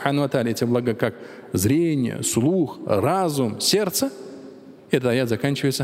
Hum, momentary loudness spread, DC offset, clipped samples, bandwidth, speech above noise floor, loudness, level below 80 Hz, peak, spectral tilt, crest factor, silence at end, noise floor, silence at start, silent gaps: none; 8 LU; under 0.1%; under 0.1%; 16 kHz; 21 dB; -22 LUFS; -60 dBFS; -2 dBFS; -5 dB/octave; 20 dB; 0 s; -43 dBFS; 0 s; none